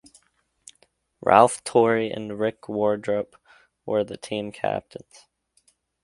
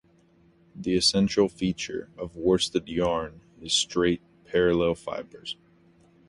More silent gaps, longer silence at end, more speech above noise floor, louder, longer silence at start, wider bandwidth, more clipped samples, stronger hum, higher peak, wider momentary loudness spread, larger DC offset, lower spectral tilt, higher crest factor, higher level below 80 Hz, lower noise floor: neither; first, 1.25 s vs 0.75 s; first, 45 dB vs 34 dB; first, -23 LUFS vs -26 LUFS; first, 1.25 s vs 0.75 s; about the same, 11.5 kHz vs 11.5 kHz; neither; neither; first, 0 dBFS vs -8 dBFS; about the same, 16 LU vs 16 LU; neither; about the same, -5 dB/octave vs -4 dB/octave; first, 24 dB vs 18 dB; second, -62 dBFS vs -52 dBFS; first, -67 dBFS vs -60 dBFS